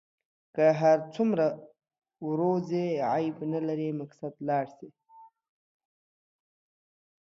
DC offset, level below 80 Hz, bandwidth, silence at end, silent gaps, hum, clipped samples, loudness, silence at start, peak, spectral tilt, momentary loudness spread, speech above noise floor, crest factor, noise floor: under 0.1%; -78 dBFS; 7.2 kHz; 2.05 s; none; none; under 0.1%; -28 LUFS; 0.55 s; -12 dBFS; -8 dB/octave; 15 LU; 29 dB; 18 dB; -56 dBFS